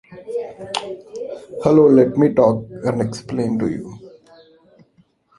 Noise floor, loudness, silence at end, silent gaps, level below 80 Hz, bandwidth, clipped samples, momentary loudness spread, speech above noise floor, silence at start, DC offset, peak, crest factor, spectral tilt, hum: -58 dBFS; -18 LUFS; 1.3 s; none; -54 dBFS; 11.5 kHz; under 0.1%; 19 LU; 41 dB; 0.1 s; under 0.1%; -2 dBFS; 18 dB; -7.5 dB/octave; none